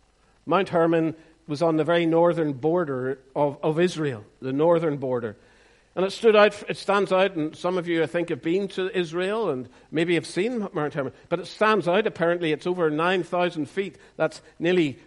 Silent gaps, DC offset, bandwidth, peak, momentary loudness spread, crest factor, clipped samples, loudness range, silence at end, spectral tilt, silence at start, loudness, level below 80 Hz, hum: none; under 0.1%; 11.5 kHz; -4 dBFS; 10 LU; 20 dB; under 0.1%; 3 LU; 0.1 s; -6 dB/octave; 0.45 s; -24 LUFS; -64 dBFS; none